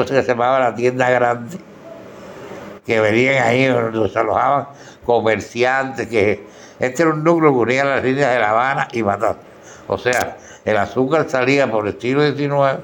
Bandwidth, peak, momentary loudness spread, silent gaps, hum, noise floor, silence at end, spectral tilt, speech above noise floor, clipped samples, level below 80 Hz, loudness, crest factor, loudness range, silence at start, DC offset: 17 kHz; -2 dBFS; 18 LU; none; none; -37 dBFS; 0 s; -5.5 dB/octave; 20 dB; under 0.1%; -58 dBFS; -17 LUFS; 16 dB; 2 LU; 0 s; under 0.1%